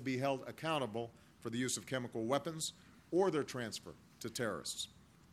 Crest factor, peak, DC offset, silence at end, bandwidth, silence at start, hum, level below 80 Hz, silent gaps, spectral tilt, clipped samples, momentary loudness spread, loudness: 20 dB; -20 dBFS; under 0.1%; 0.4 s; 15.5 kHz; 0 s; none; -74 dBFS; none; -4 dB/octave; under 0.1%; 12 LU; -39 LUFS